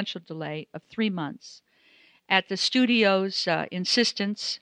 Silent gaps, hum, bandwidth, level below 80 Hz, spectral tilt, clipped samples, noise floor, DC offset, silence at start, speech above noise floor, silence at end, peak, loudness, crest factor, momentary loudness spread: none; none; 10.5 kHz; -76 dBFS; -4 dB/octave; under 0.1%; -59 dBFS; under 0.1%; 0 s; 33 dB; 0.05 s; -6 dBFS; -25 LUFS; 22 dB; 14 LU